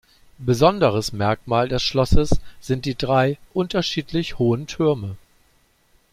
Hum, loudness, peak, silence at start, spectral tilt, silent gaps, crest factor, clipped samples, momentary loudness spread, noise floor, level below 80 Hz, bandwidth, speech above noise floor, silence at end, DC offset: none; -21 LUFS; -2 dBFS; 0.4 s; -6 dB/octave; none; 20 dB; under 0.1%; 9 LU; -60 dBFS; -32 dBFS; 14.5 kHz; 41 dB; 0.95 s; under 0.1%